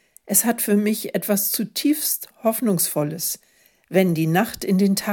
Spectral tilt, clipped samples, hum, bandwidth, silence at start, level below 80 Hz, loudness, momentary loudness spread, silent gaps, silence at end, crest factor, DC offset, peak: -4.5 dB/octave; under 0.1%; none; 17.5 kHz; 0.25 s; -62 dBFS; -21 LUFS; 5 LU; none; 0 s; 18 dB; under 0.1%; -4 dBFS